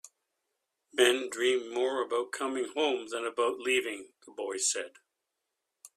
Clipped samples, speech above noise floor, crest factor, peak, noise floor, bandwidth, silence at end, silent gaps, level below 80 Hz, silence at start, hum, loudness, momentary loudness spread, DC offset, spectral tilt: under 0.1%; 54 dB; 22 dB; -10 dBFS; -85 dBFS; 14.5 kHz; 0.1 s; none; -80 dBFS; 0.05 s; none; -30 LUFS; 13 LU; under 0.1%; -0.5 dB/octave